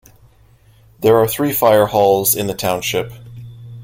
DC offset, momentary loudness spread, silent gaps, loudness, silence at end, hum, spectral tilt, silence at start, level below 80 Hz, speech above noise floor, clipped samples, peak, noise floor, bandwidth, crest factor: under 0.1%; 23 LU; none; -15 LUFS; 0 s; none; -4 dB/octave; 1 s; -48 dBFS; 35 dB; under 0.1%; 0 dBFS; -49 dBFS; 16.5 kHz; 16 dB